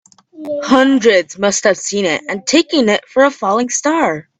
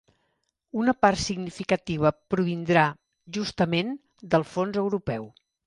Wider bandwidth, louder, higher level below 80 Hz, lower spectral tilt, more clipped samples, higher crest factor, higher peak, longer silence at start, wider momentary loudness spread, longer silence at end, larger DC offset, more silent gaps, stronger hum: second, 9.2 kHz vs 11 kHz; first, -14 LUFS vs -26 LUFS; about the same, -58 dBFS vs -54 dBFS; second, -3 dB/octave vs -5.5 dB/octave; neither; second, 14 dB vs 20 dB; first, 0 dBFS vs -6 dBFS; second, 0.35 s vs 0.75 s; second, 6 LU vs 12 LU; second, 0.2 s vs 0.35 s; neither; neither; neither